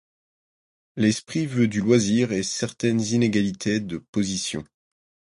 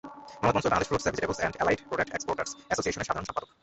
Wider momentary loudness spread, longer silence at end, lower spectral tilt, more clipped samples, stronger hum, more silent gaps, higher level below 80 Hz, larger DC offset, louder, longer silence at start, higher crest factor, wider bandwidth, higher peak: about the same, 8 LU vs 6 LU; first, 0.65 s vs 0.15 s; about the same, -5 dB/octave vs -4 dB/octave; neither; neither; first, 4.09-4.13 s vs none; about the same, -56 dBFS vs -52 dBFS; neither; first, -23 LUFS vs -29 LUFS; first, 0.95 s vs 0.05 s; about the same, 18 dB vs 20 dB; first, 11.5 kHz vs 8.4 kHz; first, -6 dBFS vs -10 dBFS